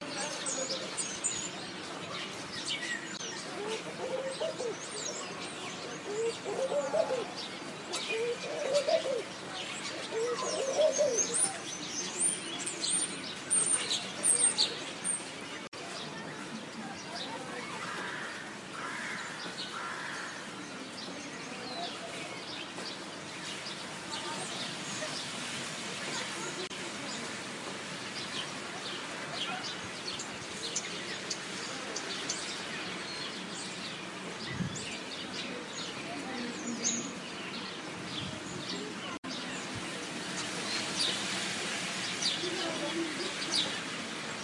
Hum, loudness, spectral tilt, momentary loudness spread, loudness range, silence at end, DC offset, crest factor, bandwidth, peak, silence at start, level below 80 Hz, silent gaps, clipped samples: none; -34 LUFS; -1.5 dB/octave; 10 LU; 9 LU; 0 s; under 0.1%; 22 dB; 12 kHz; -14 dBFS; 0 s; -74 dBFS; 15.68-15.72 s, 39.18-39.23 s; under 0.1%